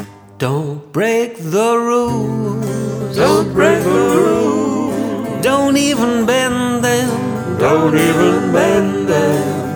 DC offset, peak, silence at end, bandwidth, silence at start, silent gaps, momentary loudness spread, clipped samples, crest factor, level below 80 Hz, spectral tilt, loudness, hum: under 0.1%; 0 dBFS; 0 s; over 20 kHz; 0 s; none; 8 LU; under 0.1%; 14 dB; -46 dBFS; -5.5 dB/octave; -15 LUFS; none